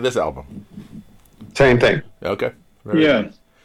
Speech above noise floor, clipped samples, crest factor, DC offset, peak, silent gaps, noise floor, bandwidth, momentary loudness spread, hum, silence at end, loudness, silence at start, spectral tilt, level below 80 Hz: 26 dB; under 0.1%; 14 dB; under 0.1%; -6 dBFS; none; -43 dBFS; 13.5 kHz; 24 LU; none; 0.35 s; -18 LUFS; 0 s; -6 dB/octave; -42 dBFS